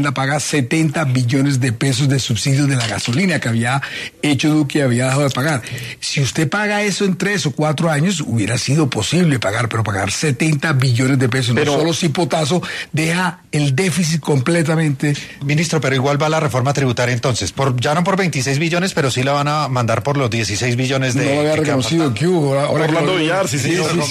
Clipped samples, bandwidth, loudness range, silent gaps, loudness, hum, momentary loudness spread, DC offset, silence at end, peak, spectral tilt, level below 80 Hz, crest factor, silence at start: under 0.1%; 13.5 kHz; 1 LU; none; -17 LUFS; none; 3 LU; under 0.1%; 0 s; -2 dBFS; -5 dB/octave; -50 dBFS; 14 dB; 0 s